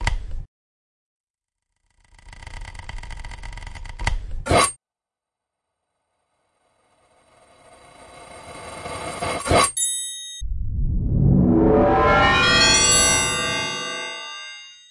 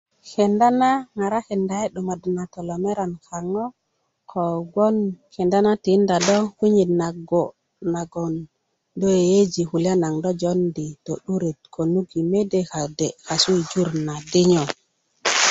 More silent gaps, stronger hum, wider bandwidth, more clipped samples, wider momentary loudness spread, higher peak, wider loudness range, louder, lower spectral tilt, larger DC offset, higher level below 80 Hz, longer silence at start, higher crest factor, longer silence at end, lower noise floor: first, 0.48-1.34 s vs none; neither; first, 11.5 kHz vs 8.2 kHz; neither; first, 24 LU vs 11 LU; about the same, -4 dBFS vs -2 dBFS; first, 22 LU vs 5 LU; first, -18 LUFS vs -22 LUFS; second, -3 dB/octave vs -5 dB/octave; neither; first, -32 dBFS vs -58 dBFS; second, 0 s vs 0.25 s; about the same, 18 dB vs 18 dB; first, 0.15 s vs 0 s; first, -90 dBFS vs -73 dBFS